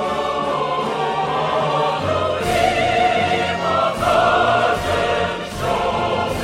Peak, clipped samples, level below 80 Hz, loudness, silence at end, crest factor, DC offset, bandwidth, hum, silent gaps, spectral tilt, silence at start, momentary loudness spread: -4 dBFS; under 0.1%; -40 dBFS; -18 LUFS; 0 s; 16 dB; under 0.1%; 16 kHz; none; none; -4.5 dB/octave; 0 s; 5 LU